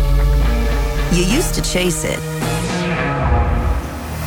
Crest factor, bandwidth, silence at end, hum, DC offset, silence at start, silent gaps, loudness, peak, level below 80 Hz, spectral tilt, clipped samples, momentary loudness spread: 14 dB; 19 kHz; 0 s; none; under 0.1%; 0 s; none; -18 LUFS; -2 dBFS; -20 dBFS; -5 dB/octave; under 0.1%; 5 LU